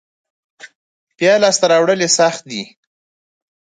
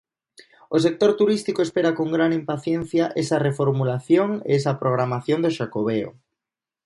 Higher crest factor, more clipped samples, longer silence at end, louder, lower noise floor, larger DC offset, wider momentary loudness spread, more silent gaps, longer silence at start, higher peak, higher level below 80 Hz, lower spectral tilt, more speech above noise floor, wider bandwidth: about the same, 18 dB vs 18 dB; neither; first, 1 s vs 0.75 s; first, -13 LUFS vs -22 LUFS; about the same, under -90 dBFS vs -88 dBFS; neither; first, 15 LU vs 6 LU; first, 0.75-1.07 s vs none; about the same, 0.65 s vs 0.7 s; first, 0 dBFS vs -4 dBFS; second, -68 dBFS vs -62 dBFS; second, -2.5 dB/octave vs -7 dB/octave; first, over 76 dB vs 67 dB; second, 9.6 kHz vs 11.5 kHz